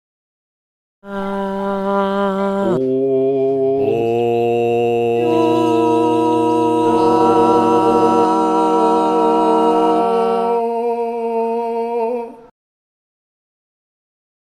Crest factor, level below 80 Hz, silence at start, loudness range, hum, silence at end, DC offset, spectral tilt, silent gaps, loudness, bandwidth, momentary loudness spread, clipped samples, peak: 16 dB; -54 dBFS; 1.05 s; 7 LU; none; 2.15 s; under 0.1%; -7 dB/octave; none; -16 LUFS; 12.5 kHz; 7 LU; under 0.1%; -2 dBFS